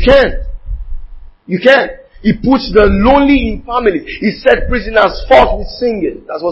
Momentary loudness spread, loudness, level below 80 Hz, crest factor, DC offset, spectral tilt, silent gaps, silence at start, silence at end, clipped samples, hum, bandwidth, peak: 14 LU; -11 LUFS; -24 dBFS; 12 dB; under 0.1%; -7.5 dB/octave; none; 0 s; 0 s; 0.5%; none; 8 kHz; 0 dBFS